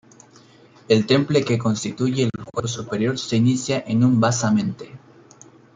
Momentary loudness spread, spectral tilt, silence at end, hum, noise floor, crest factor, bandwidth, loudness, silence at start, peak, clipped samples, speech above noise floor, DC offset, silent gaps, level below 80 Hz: 10 LU; -5.5 dB/octave; 0.8 s; none; -50 dBFS; 18 dB; 9.4 kHz; -21 LUFS; 0.9 s; -4 dBFS; under 0.1%; 30 dB; under 0.1%; none; -58 dBFS